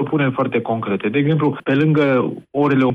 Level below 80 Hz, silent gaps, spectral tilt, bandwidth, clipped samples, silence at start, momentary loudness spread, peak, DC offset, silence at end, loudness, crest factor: -60 dBFS; none; -9.5 dB/octave; 5.2 kHz; under 0.1%; 0 s; 6 LU; -6 dBFS; under 0.1%; 0 s; -18 LUFS; 10 dB